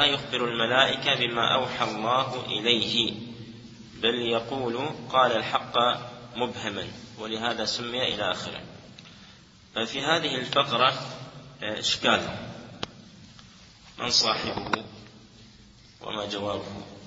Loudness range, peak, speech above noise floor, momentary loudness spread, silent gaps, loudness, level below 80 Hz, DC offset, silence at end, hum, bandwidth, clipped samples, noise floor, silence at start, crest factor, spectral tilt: 6 LU; -4 dBFS; 26 dB; 18 LU; none; -26 LUFS; -60 dBFS; under 0.1%; 0 s; none; 8 kHz; under 0.1%; -52 dBFS; 0 s; 24 dB; -3 dB/octave